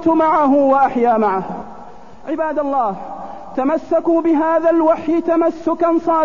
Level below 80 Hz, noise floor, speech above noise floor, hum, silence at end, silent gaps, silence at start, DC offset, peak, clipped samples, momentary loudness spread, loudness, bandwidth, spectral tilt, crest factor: -52 dBFS; -38 dBFS; 23 dB; none; 0 s; none; 0 s; 1%; -4 dBFS; under 0.1%; 16 LU; -16 LUFS; 7 kHz; -8 dB/octave; 12 dB